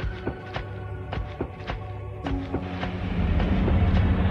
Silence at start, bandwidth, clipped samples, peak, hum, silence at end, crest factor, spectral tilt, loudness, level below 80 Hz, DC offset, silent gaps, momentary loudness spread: 0 s; 6.4 kHz; under 0.1%; -10 dBFS; none; 0 s; 16 dB; -8.5 dB/octave; -28 LUFS; -30 dBFS; under 0.1%; none; 12 LU